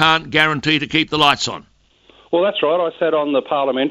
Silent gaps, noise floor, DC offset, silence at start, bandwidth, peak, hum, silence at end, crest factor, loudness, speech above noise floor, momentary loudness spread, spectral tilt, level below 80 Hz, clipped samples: none; -52 dBFS; under 0.1%; 0 s; 15.5 kHz; 0 dBFS; none; 0 s; 18 dB; -17 LUFS; 35 dB; 6 LU; -4 dB/octave; -52 dBFS; under 0.1%